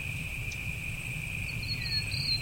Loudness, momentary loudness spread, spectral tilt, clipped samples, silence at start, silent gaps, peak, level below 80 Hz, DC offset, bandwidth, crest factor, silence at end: -33 LUFS; 6 LU; -3 dB/octave; under 0.1%; 0 s; none; -18 dBFS; -44 dBFS; under 0.1%; 16.5 kHz; 16 dB; 0 s